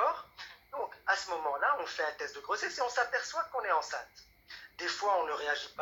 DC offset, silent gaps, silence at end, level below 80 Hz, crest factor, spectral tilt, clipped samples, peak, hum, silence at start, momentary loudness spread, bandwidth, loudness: under 0.1%; none; 0 s; -72 dBFS; 20 dB; -0.5 dB/octave; under 0.1%; -16 dBFS; none; 0 s; 16 LU; 17.5 kHz; -34 LUFS